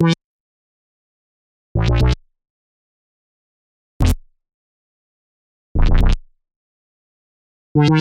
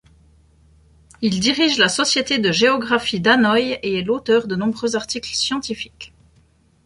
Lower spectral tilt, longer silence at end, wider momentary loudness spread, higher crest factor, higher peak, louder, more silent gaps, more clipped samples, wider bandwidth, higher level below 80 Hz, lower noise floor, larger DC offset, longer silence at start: first, -7 dB/octave vs -3.5 dB/octave; second, 0 s vs 0.8 s; about the same, 10 LU vs 10 LU; about the same, 18 dB vs 18 dB; about the same, -2 dBFS vs -2 dBFS; about the same, -20 LUFS vs -18 LUFS; first, 0.24-1.75 s, 2.50-4.00 s, 4.54-5.75 s, 6.56-7.75 s vs none; neither; about the same, 12.5 kHz vs 11.5 kHz; first, -24 dBFS vs -52 dBFS; first, under -90 dBFS vs -56 dBFS; neither; second, 0 s vs 1.2 s